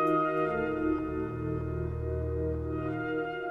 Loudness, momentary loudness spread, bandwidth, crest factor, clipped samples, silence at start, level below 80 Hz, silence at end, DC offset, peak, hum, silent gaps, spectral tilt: -32 LUFS; 6 LU; 5.2 kHz; 14 dB; under 0.1%; 0 s; -42 dBFS; 0 s; under 0.1%; -16 dBFS; none; none; -9.5 dB/octave